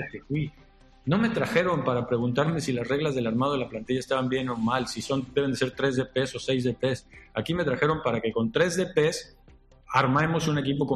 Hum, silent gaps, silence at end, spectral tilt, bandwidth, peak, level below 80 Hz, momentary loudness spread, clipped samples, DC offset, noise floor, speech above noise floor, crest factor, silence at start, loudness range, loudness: none; none; 0 s; -5.5 dB/octave; 13 kHz; -8 dBFS; -54 dBFS; 7 LU; under 0.1%; under 0.1%; -54 dBFS; 28 dB; 18 dB; 0 s; 2 LU; -27 LUFS